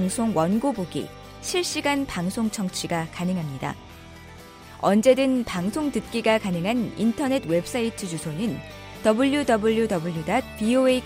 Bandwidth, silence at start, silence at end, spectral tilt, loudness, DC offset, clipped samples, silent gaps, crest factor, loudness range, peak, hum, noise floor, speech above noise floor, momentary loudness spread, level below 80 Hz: 16 kHz; 0 s; 0 s; -5 dB/octave; -24 LUFS; under 0.1%; under 0.1%; none; 18 dB; 4 LU; -6 dBFS; none; -44 dBFS; 20 dB; 14 LU; -50 dBFS